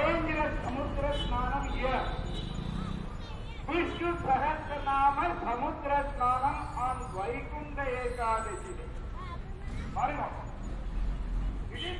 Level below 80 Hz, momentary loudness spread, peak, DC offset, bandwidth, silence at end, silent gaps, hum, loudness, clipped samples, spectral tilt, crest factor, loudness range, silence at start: -38 dBFS; 13 LU; -16 dBFS; under 0.1%; 11.5 kHz; 0 s; none; none; -33 LUFS; under 0.1%; -6 dB/octave; 16 dB; 6 LU; 0 s